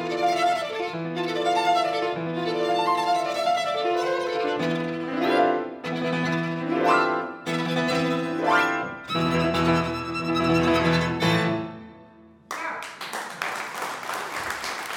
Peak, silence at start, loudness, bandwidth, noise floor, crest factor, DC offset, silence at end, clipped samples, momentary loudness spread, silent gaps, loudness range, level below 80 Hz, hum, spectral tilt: -8 dBFS; 0 s; -25 LUFS; 18.5 kHz; -50 dBFS; 18 dB; under 0.1%; 0 s; under 0.1%; 9 LU; none; 3 LU; -54 dBFS; none; -5 dB/octave